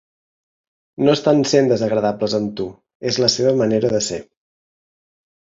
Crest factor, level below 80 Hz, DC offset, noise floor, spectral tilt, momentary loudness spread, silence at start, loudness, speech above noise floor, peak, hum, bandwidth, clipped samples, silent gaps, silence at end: 18 dB; -56 dBFS; under 0.1%; under -90 dBFS; -5 dB/octave; 12 LU; 1 s; -18 LUFS; over 73 dB; -2 dBFS; none; 7.8 kHz; under 0.1%; 2.95-3.00 s; 1.2 s